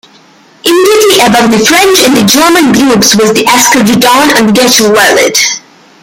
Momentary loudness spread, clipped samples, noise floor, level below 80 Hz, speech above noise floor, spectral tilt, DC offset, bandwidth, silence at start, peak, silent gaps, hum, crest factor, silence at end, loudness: 3 LU; 0.8%; -39 dBFS; -42 dBFS; 34 dB; -2.5 dB/octave; under 0.1%; over 20 kHz; 0.65 s; 0 dBFS; none; none; 6 dB; 0.45 s; -4 LUFS